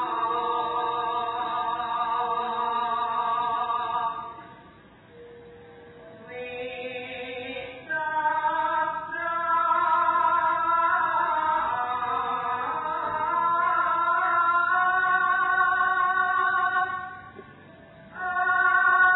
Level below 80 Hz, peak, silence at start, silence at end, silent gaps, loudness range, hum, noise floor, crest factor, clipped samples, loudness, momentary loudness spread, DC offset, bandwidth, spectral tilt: -64 dBFS; -10 dBFS; 0 s; 0 s; none; 11 LU; none; -51 dBFS; 16 dB; under 0.1%; -25 LUFS; 13 LU; under 0.1%; 4.1 kHz; -6.5 dB/octave